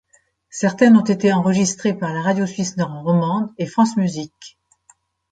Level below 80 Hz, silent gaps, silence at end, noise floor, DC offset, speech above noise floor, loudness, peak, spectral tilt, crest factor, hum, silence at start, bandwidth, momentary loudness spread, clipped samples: -60 dBFS; none; 0.85 s; -58 dBFS; under 0.1%; 40 dB; -18 LUFS; -2 dBFS; -6 dB/octave; 16 dB; none; 0.55 s; 9.2 kHz; 10 LU; under 0.1%